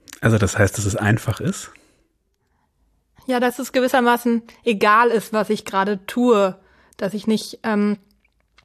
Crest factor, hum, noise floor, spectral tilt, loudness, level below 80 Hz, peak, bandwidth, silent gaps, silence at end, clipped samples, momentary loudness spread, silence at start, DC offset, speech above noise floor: 18 dB; none; -67 dBFS; -5.5 dB/octave; -20 LUFS; -50 dBFS; -2 dBFS; 14 kHz; none; 0.7 s; under 0.1%; 10 LU; 0.1 s; under 0.1%; 49 dB